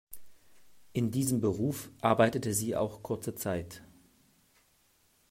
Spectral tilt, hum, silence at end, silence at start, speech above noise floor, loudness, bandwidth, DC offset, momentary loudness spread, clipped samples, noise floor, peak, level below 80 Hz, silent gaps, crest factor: -5.5 dB/octave; none; 1.45 s; 0.1 s; 38 dB; -31 LUFS; 16 kHz; under 0.1%; 18 LU; under 0.1%; -69 dBFS; -10 dBFS; -64 dBFS; none; 24 dB